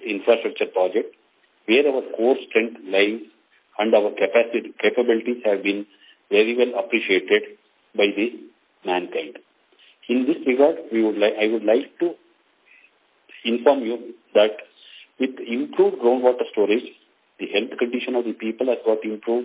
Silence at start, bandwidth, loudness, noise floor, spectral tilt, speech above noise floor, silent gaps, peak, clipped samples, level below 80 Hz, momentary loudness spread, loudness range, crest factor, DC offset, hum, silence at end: 0 s; 4 kHz; -21 LUFS; -59 dBFS; -8 dB/octave; 38 dB; none; -2 dBFS; under 0.1%; -80 dBFS; 11 LU; 3 LU; 20 dB; under 0.1%; none; 0 s